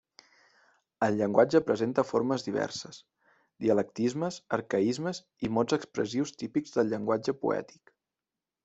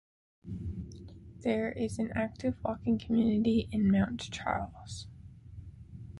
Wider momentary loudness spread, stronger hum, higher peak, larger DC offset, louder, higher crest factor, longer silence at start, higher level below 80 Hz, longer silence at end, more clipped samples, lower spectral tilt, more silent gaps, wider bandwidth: second, 9 LU vs 22 LU; neither; first, -8 dBFS vs -16 dBFS; neither; first, -29 LUFS vs -32 LUFS; about the same, 22 dB vs 18 dB; first, 1 s vs 0.45 s; second, -68 dBFS vs -50 dBFS; first, 1 s vs 0 s; neither; about the same, -6 dB/octave vs -7 dB/octave; neither; second, 8.2 kHz vs 11.5 kHz